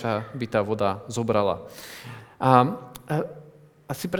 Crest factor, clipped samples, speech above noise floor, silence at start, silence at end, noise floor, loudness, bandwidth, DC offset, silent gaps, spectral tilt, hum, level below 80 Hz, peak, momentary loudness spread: 24 dB; under 0.1%; 25 dB; 0 s; 0 s; -49 dBFS; -25 LUFS; over 20 kHz; under 0.1%; none; -6.5 dB/octave; none; -60 dBFS; -2 dBFS; 20 LU